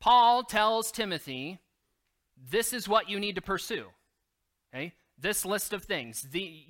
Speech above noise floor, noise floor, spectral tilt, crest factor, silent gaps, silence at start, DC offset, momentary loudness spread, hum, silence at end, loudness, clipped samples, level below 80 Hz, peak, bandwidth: 52 dB; -81 dBFS; -2.5 dB/octave; 20 dB; none; 0 s; under 0.1%; 15 LU; none; 0.1 s; -29 LUFS; under 0.1%; -60 dBFS; -10 dBFS; 17 kHz